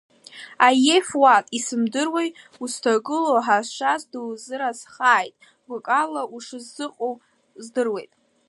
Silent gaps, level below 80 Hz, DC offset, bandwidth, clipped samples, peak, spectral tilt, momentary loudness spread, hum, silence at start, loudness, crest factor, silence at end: none; -78 dBFS; under 0.1%; 11.5 kHz; under 0.1%; -2 dBFS; -2 dB/octave; 18 LU; none; 0.35 s; -21 LUFS; 20 dB; 0.45 s